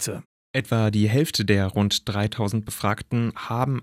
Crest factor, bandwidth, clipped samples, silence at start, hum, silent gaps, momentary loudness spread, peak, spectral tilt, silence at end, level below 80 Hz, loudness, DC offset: 16 dB; 16 kHz; under 0.1%; 0 s; none; 0.25-0.54 s; 7 LU; -6 dBFS; -5.5 dB/octave; 0 s; -54 dBFS; -24 LUFS; under 0.1%